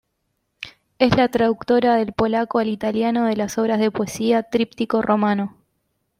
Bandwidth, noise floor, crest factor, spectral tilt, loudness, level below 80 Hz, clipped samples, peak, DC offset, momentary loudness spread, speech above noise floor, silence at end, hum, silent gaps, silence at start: 15.5 kHz; -73 dBFS; 16 dB; -6 dB/octave; -20 LUFS; -52 dBFS; under 0.1%; -4 dBFS; under 0.1%; 8 LU; 54 dB; 0.7 s; none; none; 0.6 s